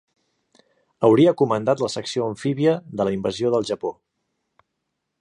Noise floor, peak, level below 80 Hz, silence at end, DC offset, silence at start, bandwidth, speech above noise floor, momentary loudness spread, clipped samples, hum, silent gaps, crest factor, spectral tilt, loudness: -78 dBFS; -4 dBFS; -60 dBFS; 1.3 s; under 0.1%; 1 s; 11 kHz; 58 dB; 10 LU; under 0.1%; none; none; 18 dB; -6.5 dB/octave; -21 LUFS